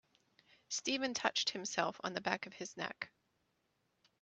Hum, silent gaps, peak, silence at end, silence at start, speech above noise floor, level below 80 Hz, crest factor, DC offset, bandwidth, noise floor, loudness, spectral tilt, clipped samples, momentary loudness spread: none; none; -14 dBFS; 1.15 s; 0.7 s; 42 dB; -84 dBFS; 28 dB; under 0.1%; 8.4 kHz; -81 dBFS; -38 LUFS; -2 dB/octave; under 0.1%; 10 LU